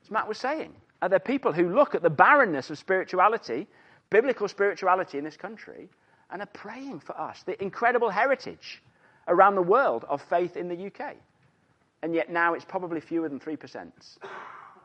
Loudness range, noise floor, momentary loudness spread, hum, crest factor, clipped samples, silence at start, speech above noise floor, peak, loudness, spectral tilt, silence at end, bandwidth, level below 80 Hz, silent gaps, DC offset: 8 LU; -67 dBFS; 22 LU; none; 24 dB; under 0.1%; 0.1 s; 41 dB; -4 dBFS; -25 LUFS; -6 dB/octave; 0.15 s; 8.6 kHz; -76 dBFS; none; under 0.1%